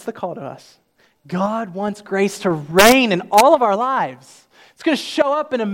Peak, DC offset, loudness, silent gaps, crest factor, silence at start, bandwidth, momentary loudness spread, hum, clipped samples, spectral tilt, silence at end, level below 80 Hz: 0 dBFS; under 0.1%; -17 LUFS; none; 18 dB; 0.05 s; 16.5 kHz; 17 LU; none; under 0.1%; -4 dB/octave; 0 s; -52 dBFS